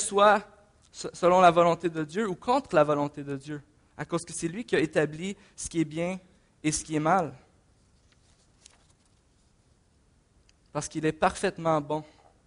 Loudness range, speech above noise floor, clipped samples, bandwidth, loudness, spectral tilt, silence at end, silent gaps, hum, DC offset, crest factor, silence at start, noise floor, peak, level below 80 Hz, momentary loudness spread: 9 LU; 38 dB; under 0.1%; 10.5 kHz; -27 LUFS; -5 dB/octave; 0.45 s; none; none; under 0.1%; 20 dB; 0 s; -64 dBFS; -8 dBFS; -58 dBFS; 16 LU